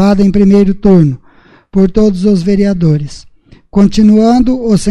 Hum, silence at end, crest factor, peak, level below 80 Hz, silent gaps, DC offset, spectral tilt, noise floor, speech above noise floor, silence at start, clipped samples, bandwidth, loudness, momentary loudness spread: none; 0 s; 8 dB; 0 dBFS; -28 dBFS; none; under 0.1%; -8 dB/octave; -43 dBFS; 35 dB; 0 s; 0.1%; 11 kHz; -9 LUFS; 9 LU